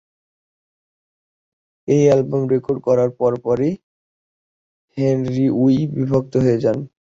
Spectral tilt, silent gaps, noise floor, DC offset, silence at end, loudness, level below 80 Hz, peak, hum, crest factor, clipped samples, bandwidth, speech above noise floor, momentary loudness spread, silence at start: -8.5 dB/octave; 3.83-4.88 s; under -90 dBFS; under 0.1%; 0.15 s; -18 LUFS; -54 dBFS; -2 dBFS; none; 16 dB; under 0.1%; 7.6 kHz; over 73 dB; 7 LU; 1.85 s